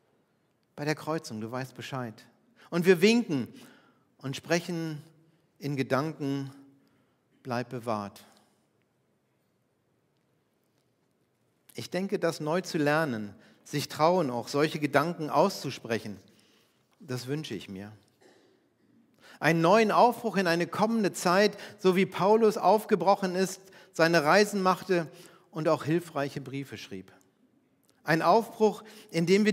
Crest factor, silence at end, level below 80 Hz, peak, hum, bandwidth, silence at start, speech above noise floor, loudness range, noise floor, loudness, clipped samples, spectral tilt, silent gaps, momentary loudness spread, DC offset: 22 dB; 0 s; -80 dBFS; -8 dBFS; none; 16 kHz; 0.75 s; 45 dB; 14 LU; -73 dBFS; -28 LUFS; under 0.1%; -5.5 dB/octave; none; 18 LU; under 0.1%